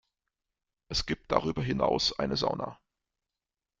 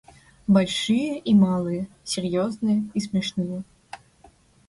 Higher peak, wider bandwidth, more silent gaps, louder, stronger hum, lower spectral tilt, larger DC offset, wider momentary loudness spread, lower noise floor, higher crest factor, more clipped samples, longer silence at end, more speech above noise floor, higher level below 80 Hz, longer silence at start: about the same, -8 dBFS vs -8 dBFS; second, 9.2 kHz vs 11.5 kHz; neither; second, -30 LUFS vs -23 LUFS; neither; second, -4.5 dB/octave vs -6 dB/octave; neither; second, 7 LU vs 18 LU; first, under -90 dBFS vs -55 dBFS; first, 26 dB vs 16 dB; neither; first, 1.05 s vs 0.7 s; first, over 60 dB vs 33 dB; first, -50 dBFS vs -58 dBFS; first, 0.9 s vs 0.5 s